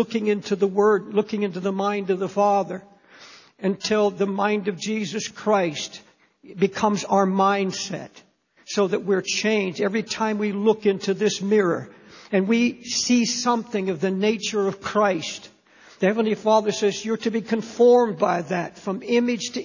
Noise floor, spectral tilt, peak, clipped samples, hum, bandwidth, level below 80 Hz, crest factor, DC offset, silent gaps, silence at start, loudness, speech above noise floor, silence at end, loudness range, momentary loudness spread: -48 dBFS; -4.5 dB/octave; -6 dBFS; under 0.1%; none; 7.4 kHz; -66 dBFS; 18 dB; under 0.1%; none; 0 s; -22 LUFS; 26 dB; 0 s; 3 LU; 9 LU